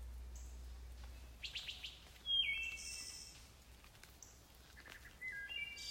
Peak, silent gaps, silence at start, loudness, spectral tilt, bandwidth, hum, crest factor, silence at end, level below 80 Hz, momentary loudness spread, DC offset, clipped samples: -28 dBFS; none; 0 s; -43 LUFS; -0.5 dB/octave; 16 kHz; none; 20 dB; 0 s; -58 dBFS; 23 LU; under 0.1%; under 0.1%